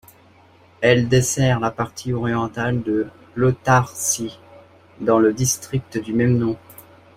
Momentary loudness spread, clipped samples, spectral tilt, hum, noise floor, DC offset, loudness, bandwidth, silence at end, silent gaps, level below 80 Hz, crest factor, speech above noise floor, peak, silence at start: 9 LU; under 0.1%; -5 dB/octave; none; -51 dBFS; under 0.1%; -20 LUFS; 16 kHz; 0.35 s; none; -48 dBFS; 18 dB; 32 dB; -2 dBFS; 0.8 s